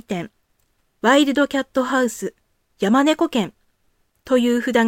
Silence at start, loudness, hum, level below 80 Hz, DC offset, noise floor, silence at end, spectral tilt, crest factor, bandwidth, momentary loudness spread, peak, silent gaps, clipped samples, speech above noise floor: 0.1 s; -19 LUFS; none; -60 dBFS; under 0.1%; -66 dBFS; 0 s; -4.5 dB/octave; 16 dB; 16.5 kHz; 14 LU; -4 dBFS; none; under 0.1%; 48 dB